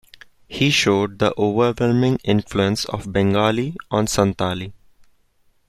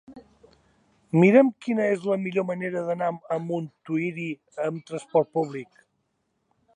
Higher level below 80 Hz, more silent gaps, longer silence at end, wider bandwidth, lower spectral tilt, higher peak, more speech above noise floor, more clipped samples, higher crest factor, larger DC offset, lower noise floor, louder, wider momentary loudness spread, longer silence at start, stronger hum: first, -46 dBFS vs -74 dBFS; neither; second, 0.95 s vs 1.1 s; first, 14.5 kHz vs 10 kHz; second, -5 dB/octave vs -8 dB/octave; about the same, -2 dBFS vs -4 dBFS; second, 41 dB vs 50 dB; neither; about the same, 18 dB vs 22 dB; neither; second, -60 dBFS vs -74 dBFS; first, -19 LUFS vs -25 LUFS; second, 8 LU vs 14 LU; first, 0.5 s vs 0.1 s; neither